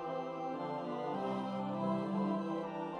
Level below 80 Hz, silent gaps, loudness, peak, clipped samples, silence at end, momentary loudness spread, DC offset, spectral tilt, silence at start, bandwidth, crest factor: -76 dBFS; none; -38 LUFS; -24 dBFS; under 0.1%; 0 s; 4 LU; under 0.1%; -8 dB/octave; 0 s; 9.4 kHz; 14 dB